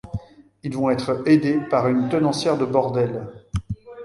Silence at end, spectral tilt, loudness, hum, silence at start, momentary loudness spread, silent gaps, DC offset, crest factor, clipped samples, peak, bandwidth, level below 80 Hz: 0 s; -7 dB/octave; -21 LUFS; none; 0.05 s; 16 LU; none; under 0.1%; 18 dB; under 0.1%; -4 dBFS; 11.5 kHz; -44 dBFS